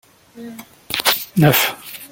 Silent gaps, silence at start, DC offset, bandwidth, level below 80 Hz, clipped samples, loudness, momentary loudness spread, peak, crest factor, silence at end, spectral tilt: none; 0.35 s; under 0.1%; 17 kHz; -54 dBFS; under 0.1%; -16 LUFS; 22 LU; 0 dBFS; 18 dB; 0.05 s; -4 dB/octave